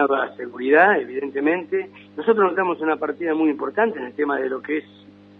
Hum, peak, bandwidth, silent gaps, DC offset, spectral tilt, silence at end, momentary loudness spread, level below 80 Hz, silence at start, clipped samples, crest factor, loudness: 50 Hz at -50 dBFS; -2 dBFS; 4.3 kHz; none; under 0.1%; -8 dB/octave; 0.55 s; 11 LU; -76 dBFS; 0 s; under 0.1%; 20 dB; -21 LUFS